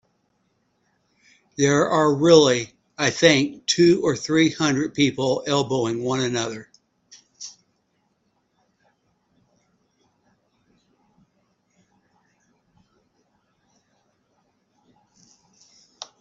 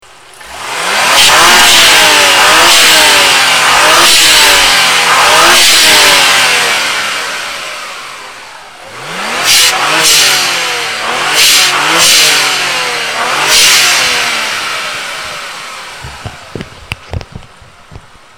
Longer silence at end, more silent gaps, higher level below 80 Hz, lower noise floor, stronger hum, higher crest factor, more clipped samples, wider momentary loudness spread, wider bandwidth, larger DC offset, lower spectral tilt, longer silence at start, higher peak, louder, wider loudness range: second, 0.15 s vs 0.4 s; neither; second, -62 dBFS vs -38 dBFS; first, -70 dBFS vs -36 dBFS; neither; first, 24 dB vs 8 dB; second, under 0.1% vs 1%; first, 24 LU vs 21 LU; second, 8.2 kHz vs over 20 kHz; neither; first, -4.5 dB/octave vs 0.5 dB/octave; first, 1.6 s vs 0.35 s; about the same, 0 dBFS vs 0 dBFS; second, -20 LUFS vs -5 LUFS; about the same, 11 LU vs 10 LU